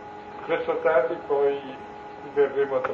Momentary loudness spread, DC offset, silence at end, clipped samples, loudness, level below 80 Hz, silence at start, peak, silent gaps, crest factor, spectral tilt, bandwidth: 17 LU; under 0.1%; 0 s; under 0.1%; -25 LUFS; -64 dBFS; 0 s; -8 dBFS; none; 18 dB; -6.5 dB/octave; 5.8 kHz